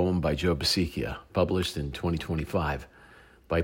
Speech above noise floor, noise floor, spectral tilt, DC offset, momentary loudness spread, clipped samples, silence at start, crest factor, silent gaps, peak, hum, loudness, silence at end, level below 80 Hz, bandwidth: 26 dB; -54 dBFS; -5.5 dB/octave; under 0.1%; 7 LU; under 0.1%; 0 s; 16 dB; none; -12 dBFS; none; -29 LUFS; 0 s; -42 dBFS; 16 kHz